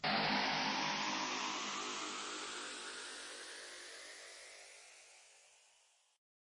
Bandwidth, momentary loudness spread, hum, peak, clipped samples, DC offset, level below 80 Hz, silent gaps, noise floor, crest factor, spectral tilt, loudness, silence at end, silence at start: 11 kHz; 21 LU; none; -22 dBFS; under 0.1%; under 0.1%; -80 dBFS; none; -72 dBFS; 20 dB; -1.5 dB/octave; -40 LUFS; 1.05 s; 0 s